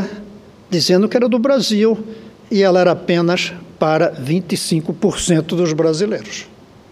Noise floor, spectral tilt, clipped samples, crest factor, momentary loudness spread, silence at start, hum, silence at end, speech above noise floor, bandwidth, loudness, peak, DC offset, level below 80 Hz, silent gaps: -39 dBFS; -5 dB/octave; under 0.1%; 16 dB; 10 LU; 0 s; none; 0.45 s; 23 dB; 15 kHz; -16 LUFS; 0 dBFS; under 0.1%; -48 dBFS; none